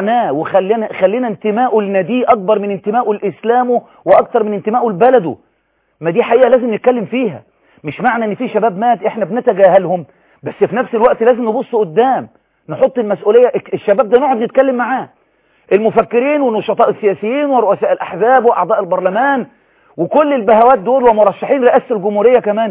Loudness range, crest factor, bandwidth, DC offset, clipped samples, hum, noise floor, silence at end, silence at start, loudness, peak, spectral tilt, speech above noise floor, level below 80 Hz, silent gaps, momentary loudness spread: 3 LU; 12 dB; 4 kHz; under 0.1%; under 0.1%; none; -61 dBFS; 0 s; 0 s; -13 LUFS; 0 dBFS; -10 dB/octave; 49 dB; -56 dBFS; none; 8 LU